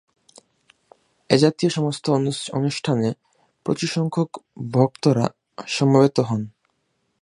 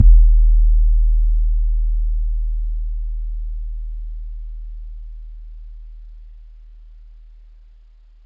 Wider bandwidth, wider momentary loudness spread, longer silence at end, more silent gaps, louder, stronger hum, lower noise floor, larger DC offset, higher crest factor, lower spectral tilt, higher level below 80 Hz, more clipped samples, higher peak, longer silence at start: first, 11.5 kHz vs 0.3 kHz; second, 11 LU vs 23 LU; second, 0.75 s vs 1.35 s; neither; about the same, -21 LUFS vs -21 LUFS; neither; first, -71 dBFS vs -46 dBFS; neither; first, 22 dB vs 16 dB; second, -6 dB/octave vs -12 dB/octave; second, -62 dBFS vs -16 dBFS; neither; about the same, 0 dBFS vs 0 dBFS; first, 1.3 s vs 0 s